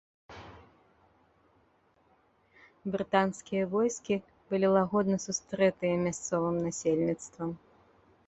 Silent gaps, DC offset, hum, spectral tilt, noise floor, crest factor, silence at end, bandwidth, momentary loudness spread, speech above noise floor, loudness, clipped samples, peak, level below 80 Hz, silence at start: none; under 0.1%; none; -5.5 dB/octave; -68 dBFS; 22 dB; 0.7 s; 8.2 kHz; 18 LU; 38 dB; -30 LUFS; under 0.1%; -10 dBFS; -66 dBFS; 0.3 s